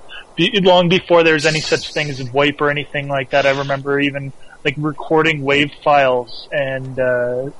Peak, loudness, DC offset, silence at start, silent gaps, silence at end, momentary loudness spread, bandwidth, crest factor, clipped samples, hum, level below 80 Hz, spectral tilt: -2 dBFS; -16 LUFS; under 0.1%; 0 s; none; 0 s; 10 LU; 11.5 kHz; 16 dB; under 0.1%; none; -48 dBFS; -5 dB/octave